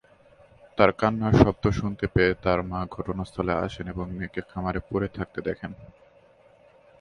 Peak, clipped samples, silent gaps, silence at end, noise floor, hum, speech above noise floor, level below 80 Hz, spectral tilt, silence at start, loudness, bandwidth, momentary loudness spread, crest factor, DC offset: 0 dBFS; under 0.1%; none; 1.15 s; -57 dBFS; none; 31 dB; -42 dBFS; -7.5 dB/octave; 0.75 s; -26 LUFS; 10.5 kHz; 13 LU; 26 dB; under 0.1%